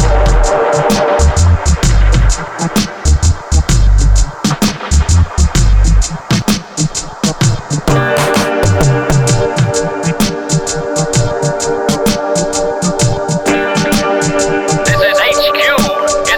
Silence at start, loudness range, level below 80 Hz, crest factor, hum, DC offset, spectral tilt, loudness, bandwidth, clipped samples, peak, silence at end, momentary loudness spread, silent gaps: 0 s; 2 LU; -16 dBFS; 10 dB; none; under 0.1%; -4.5 dB/octave; -12 LUFS; 18.5 kHz; under 0.1%; -2 dBFS; 0 s; 5 LU; none